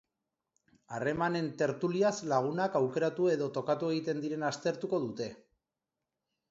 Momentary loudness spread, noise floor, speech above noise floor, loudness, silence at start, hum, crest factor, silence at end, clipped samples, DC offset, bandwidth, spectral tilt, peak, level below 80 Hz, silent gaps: 6 LU; -89 dBFS; 57 dB; -32 LUFS; 0.9 s; none; 18 dB; 1.15 s; under 0.1%; under 0.1%; 8 kHz; -6 dB/octave; -16 dBFS; -74 dBFS; none